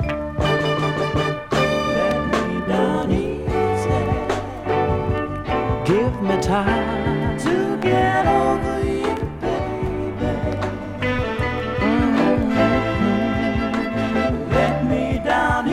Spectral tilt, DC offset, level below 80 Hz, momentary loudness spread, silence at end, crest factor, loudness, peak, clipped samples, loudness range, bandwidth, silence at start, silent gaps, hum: -6.5 dB/octave; under 0.1%; -34 dBFS; 6 LU; 0 s; 16 dB; -20 LUFS; -4 dBFS; under 0.1%; 2 LU; 14 kHz; 0 s; none; none